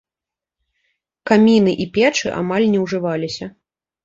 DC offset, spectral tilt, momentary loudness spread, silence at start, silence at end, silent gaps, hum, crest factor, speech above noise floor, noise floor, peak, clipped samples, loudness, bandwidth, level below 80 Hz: under 0.1%; -5.5 dB/octave; 15 LU; 1.25 s; 0.55 s; none; none; 18 dB; 72 dB; -88 dBFS; -2 dBFS; under 0.1%; -17 LUFS; 7.8 kHz; -56 dBFS